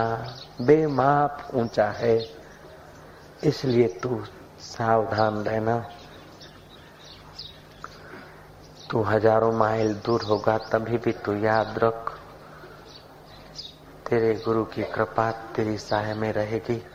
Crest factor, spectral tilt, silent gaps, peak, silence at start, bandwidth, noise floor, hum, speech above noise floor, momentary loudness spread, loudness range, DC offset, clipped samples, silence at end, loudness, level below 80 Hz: 20 dB; -7 dB/octave; none; -4 dBFS; 0 s; 15.5 kHz; -48 dBFS; none; 24 dB; 24 LU; 6 LU; under 0.1%; under 0.1%; 0 s; -24 LUFS; -56 dBFS